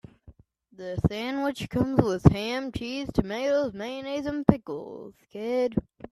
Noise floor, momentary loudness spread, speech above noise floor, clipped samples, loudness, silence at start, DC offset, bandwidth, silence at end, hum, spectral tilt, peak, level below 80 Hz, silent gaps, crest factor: -55 dBFS; 15 LU; 29 dB; under 0.1%; -27 LUFS; 0.25 s; under 0.1%; 13.5 kHz; 0.3 s; none; -7.5 dB/octave; 0 dBFS; -44 dBFS; none; 26 dB